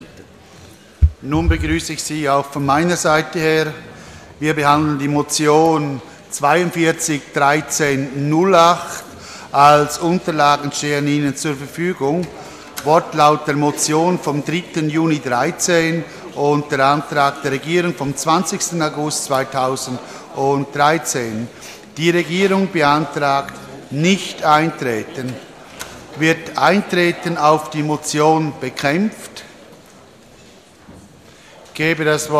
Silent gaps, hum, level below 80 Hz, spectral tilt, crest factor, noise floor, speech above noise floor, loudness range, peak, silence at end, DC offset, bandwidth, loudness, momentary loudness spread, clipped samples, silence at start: none; none; -36 dBFS; -4.5 dB/octave; 18 dB; -44 dBFS; 28 dB; 4 LU; 0 dBFS; 0 s; under 0.1%; 15 kHz; -17 LUFS; 15 LU; under 0.1%; 0 s